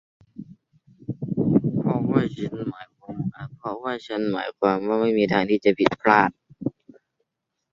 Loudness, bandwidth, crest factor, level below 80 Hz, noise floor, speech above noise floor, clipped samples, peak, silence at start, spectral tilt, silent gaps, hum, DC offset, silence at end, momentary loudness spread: -23 LUFS; 7.4 kHz; 22 dB; -58 dBFS; -81 dBFS; 59 dB; under 0.1%; -2 dBFS; 0.4 s; -8 dB/octave; none; none; under 0.1%; 1 s; 17 LU